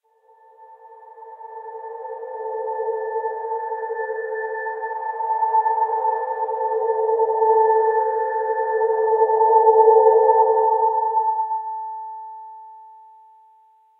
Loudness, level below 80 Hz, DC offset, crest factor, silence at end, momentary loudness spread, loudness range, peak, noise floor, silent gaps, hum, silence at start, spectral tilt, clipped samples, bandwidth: -20 LUFS; under -90 dBFS; under 0.1%; 18 dB; 1.05 s; 19 LU; 12 LU; -2 dBFS; -55 dBFS; none; none; 0.6 s; -6 dB/octave; under 0.1%; 2.1 kHz